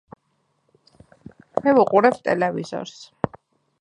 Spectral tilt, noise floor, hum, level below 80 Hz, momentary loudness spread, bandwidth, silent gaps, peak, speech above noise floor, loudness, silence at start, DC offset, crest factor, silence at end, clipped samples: -6.5 dB/octave; -69 dBFS; none; -60 dBFS; 15 LU; 11 kHz; none; -2 dBFS; 50 dB; -21 LUFS; 1.55 s; under 0.1%; 22 dB; 0.55 s; under 0.1%